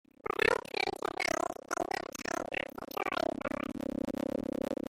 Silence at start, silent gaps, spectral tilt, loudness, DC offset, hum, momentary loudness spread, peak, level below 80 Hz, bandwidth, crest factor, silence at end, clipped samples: 0.25 s; none; -3.5 dB/octave; -35 LUFS; under 0.1%; none; 8 LU; -14 dBFS; -62 dBFS; 16.5 kHz; 22 dB; 0.15 s; under 0.1%